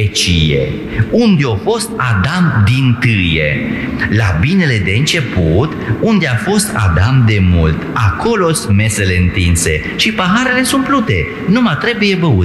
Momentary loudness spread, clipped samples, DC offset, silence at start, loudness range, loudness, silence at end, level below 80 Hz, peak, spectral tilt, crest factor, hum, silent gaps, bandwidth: 4 LU; under 0.1%; under 0.1%; 0 s; 1 LU; -12 LUFS; 0 s; -28 dBFS; -2 dBFS; -5 dB/octave; 10 dB; none; none; 13.5 kHz